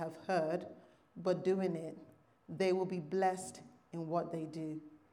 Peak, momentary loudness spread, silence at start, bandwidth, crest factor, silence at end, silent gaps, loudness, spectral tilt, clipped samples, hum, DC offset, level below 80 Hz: -22 dBFS; 16 LU; 0 s; 12 kHz; 16 dB; 0.15 s; none; -37 LUFS; -6.5 dB/octave; under 0.1%; none; under 0.1%; -84 dBFS